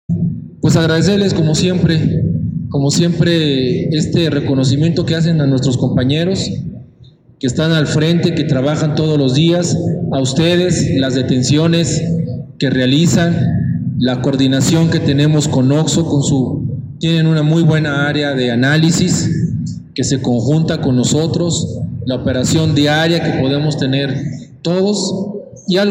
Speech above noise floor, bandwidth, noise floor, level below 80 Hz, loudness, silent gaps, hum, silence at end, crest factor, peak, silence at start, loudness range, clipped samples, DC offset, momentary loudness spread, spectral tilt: 30 dB; 14.5 kHz; -43 dBFS; -40 dBFS; -14 LUFS; none; none; 0 s; 12 dB; -2 dBFS; 0.1 s; 2 LU; under 0.1%; under 0.1%; 7 LU; -5.5 dB/octave